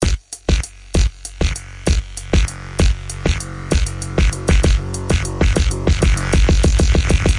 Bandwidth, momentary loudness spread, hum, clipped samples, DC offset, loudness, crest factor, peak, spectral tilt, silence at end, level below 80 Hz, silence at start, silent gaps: 11.5 kHz; 7 LU; none; under 0.1%; under 0.1%; -18 LUFS; 14 dB; -2 dBFS; -5 dB/octave; 0 s; -18 dBFS; 0 s; none